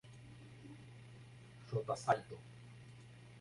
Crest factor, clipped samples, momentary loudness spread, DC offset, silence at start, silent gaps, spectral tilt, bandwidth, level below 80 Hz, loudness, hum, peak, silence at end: 26 dB; under 0.1%; 20 LU; under 0.1%; 0.05 s; none; -5.5 dB/octave; 11.5 kHz; -72 dBFS; -40 LUFS; none; -18 dBFS; 0 s